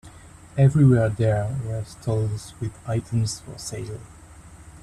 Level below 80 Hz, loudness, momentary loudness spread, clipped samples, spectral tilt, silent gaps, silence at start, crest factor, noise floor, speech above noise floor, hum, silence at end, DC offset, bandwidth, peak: -48 dBFS; -23 LUFS; 16 LU; under 0.1%; -7 dB/octave; none; 0.05 s; 16 dB; -45 dBFS; 23 dB; none; 0.05 s; under 0.1%; 12.5 kHz; -6 dBFS